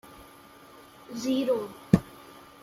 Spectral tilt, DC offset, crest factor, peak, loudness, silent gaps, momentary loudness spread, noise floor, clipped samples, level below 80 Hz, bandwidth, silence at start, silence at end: -7 dB/octave; under 0.1%; 28 dB; -2 dBFS; -28 LUFS; none; 25 LU; -52 dBFS; under 0.1%; -54 dBFS; 16 kHz; 0.1 s; 0.2 s